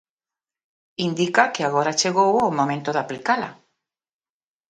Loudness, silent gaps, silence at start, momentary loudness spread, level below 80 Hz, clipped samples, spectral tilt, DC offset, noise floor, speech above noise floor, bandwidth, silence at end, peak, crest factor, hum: -21 LUFS; none; 1 s; 8 LU; -66 dBFS; under 0.1%; -4 dB/octave; under 0.1%; under -90 dBFS; over 69 dB; 11 kHz; 1.15 s; 0 dBFS; 24 dB; none